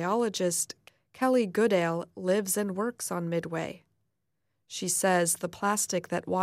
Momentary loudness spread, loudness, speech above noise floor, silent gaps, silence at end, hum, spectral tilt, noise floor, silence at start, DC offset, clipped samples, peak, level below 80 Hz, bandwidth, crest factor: 10 LU; -28 LUFS; 53 dB; none; 0 s; none; -4 dB/octave; -82 dBFS; 0 s; under 0.1%; under 0.1%; -14 dBFS; -74 dBFS; 16 kHz; 16 dB